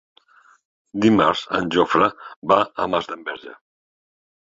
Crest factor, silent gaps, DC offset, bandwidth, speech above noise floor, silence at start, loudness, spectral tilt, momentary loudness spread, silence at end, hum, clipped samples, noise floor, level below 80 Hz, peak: 20 dB; 2.36-2.42 s; under 0.1%; 7.8 kHz; 35 dB; 0.95 s; -20 LUFS; -6 dB/octave; 15 LU; 1 s; none; under 0.1%; -54 dBFS; -56 dBFS; -2 dBFS